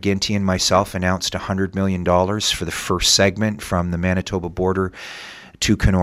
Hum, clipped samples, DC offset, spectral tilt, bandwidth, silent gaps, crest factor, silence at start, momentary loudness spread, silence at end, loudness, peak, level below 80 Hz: none; under 0.1%; under 0.1%; -4 dB/octave; 15.5 kHz; none; 18 dB; 0 s; 9 LU; 0 s; -19 LUFS; -2 dBFS; -34 dBFS